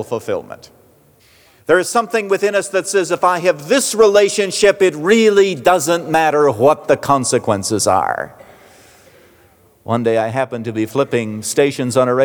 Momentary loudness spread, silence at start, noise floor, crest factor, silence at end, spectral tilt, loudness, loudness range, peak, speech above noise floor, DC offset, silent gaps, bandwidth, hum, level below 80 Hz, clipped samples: 10 LU; 0 s; -51 dBFS; 14 dB; 0 s; -4 dB/octave; -15 LUFS; 7 LU; -2 dBFS; 36 dB; under 0.1%; none; over 20 kHz; none; -56 dBFS; under 0.1%